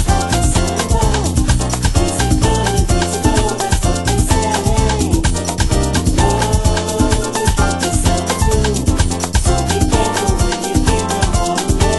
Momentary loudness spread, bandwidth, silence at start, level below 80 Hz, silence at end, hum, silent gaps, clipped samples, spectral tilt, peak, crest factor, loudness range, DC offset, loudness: 2 LU; 12.5 kHz; 0 s; -18 dBFS; 0 s; none; none; under 0.1%; -4.5 dB/octave; 0 dBFS; 14 dB; 0 LU; under 0.1%; -15 LUFS